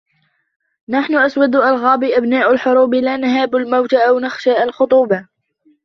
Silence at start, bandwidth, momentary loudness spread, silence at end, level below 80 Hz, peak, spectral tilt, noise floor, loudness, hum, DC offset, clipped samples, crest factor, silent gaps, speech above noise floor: 0.9 s; 6.4 kHz; 4 LU; 0.6 s; -60 dBFS; -2 dBFS; -6 dB/octave; -63 dBFS; -14 LUFS; none; under 0.1%; under 0.1%; 14 dB; none; 49 dB